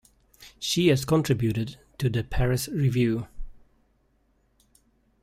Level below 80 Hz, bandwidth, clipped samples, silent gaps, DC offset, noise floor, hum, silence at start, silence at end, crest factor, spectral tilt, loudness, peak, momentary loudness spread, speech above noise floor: -42 dBFS; 16 kHz; under 0.1%; none; under 0.1%; -67 dBFS; none; 0.4 s; 1.65 s; 18 dB; -6 dB/octave; -26 LUFS; -8 dBFS; 11 LU; 43 dB